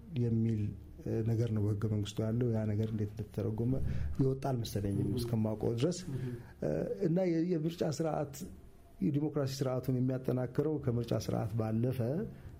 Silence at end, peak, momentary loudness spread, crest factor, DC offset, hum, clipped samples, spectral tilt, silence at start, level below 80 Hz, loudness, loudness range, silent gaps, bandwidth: 0 s; -20 dBFS; 6 LU; 14 dB; under 0.1%; none; under 0.1%; -7.5 dB/octave; 0 s; -52 dBFS; -35 LUFS; 1 LU; none; 16 kHz